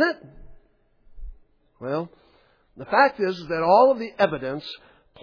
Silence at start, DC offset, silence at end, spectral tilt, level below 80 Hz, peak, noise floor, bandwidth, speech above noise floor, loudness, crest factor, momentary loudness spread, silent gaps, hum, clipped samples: 0 s; under 0.1%; 0.45 s; -6.5 dB/octave; -48 dBFS; -4 dBFS; -60 dBFS; 5.4 kHz; 38 dB; -22 LUFS; 20 dB; 21 LU; none; none; under 0.1%